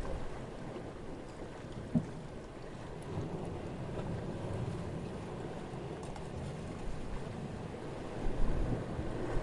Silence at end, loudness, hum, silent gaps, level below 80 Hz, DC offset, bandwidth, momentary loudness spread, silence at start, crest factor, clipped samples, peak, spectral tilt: 0 s; -42 LUFS; none; none; -44 dBFS; under 0.1%; 11.5 kHz; 9 LU; 0 s; 20 dB; under 0.1%; -18 dBFS; -7 dB/octave